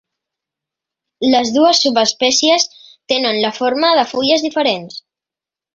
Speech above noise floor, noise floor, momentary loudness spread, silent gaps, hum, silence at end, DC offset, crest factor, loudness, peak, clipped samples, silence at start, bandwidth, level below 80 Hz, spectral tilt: 74 dB; -88 dBFS; 8 LU; none; none; 0.75 s; under 0.1%; 16 dB; -14 LUFS; 0 dBFS; under 0.1%; 1.2 s; 7.8 kHz; -62 dBFS; -2 dB/octave